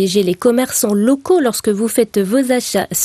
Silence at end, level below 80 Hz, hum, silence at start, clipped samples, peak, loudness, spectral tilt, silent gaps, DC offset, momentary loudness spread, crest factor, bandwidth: 0 s; -54 dBFS; none; 0 s; under 0.1%; -2 dBFS; -15 LUFS; -4 dB/octave; none; under 0.1%; 3 LU; 14 dB; 15 kHz